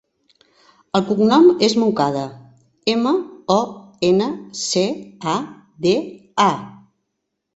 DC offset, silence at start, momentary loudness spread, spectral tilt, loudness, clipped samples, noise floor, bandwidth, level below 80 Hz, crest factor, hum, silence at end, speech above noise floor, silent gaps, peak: under 0.1%; 0.95 s; 14 LU; -5 dB/octave; -19 LUFS; under 0.1%; -76 dBFS; 8.2 kHz; -60 dBFS; 18 dB; none; 0.8 s; 59 dB; none; -2 dBFS